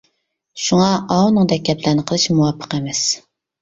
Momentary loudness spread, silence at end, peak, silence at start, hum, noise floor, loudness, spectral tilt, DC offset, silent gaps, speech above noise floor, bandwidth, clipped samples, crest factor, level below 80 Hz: 9 LU; 0.45 s; -2 dBFS; 0.55 s; none; -68 dBFS; -17 LUFS; -5 dB/octave; under 0.1%; none; 52 dB; 7.8 kHz; under 0.1%; 16 dB; -52 dBFS